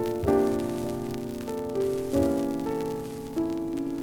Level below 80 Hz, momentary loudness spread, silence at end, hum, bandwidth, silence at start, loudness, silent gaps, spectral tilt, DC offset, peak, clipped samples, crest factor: -50 dBFS; 9 LU; 0 s; none; over 20 kHz; 0 s; -29 LUFS; none; -7 dB/octave; under 0.1%; -10 dBFS; under 0.1%; 18 dB